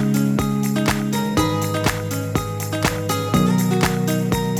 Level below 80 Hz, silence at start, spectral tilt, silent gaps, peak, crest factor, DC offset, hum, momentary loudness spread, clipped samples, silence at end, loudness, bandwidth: -38 dBFS; 0 s; -5.5 dB/octave; none; -4 dBFS; 16 dB; under 0.1%; none; 5 LU; under 0.1%; 0 s; -20 LUFS; 19 kHz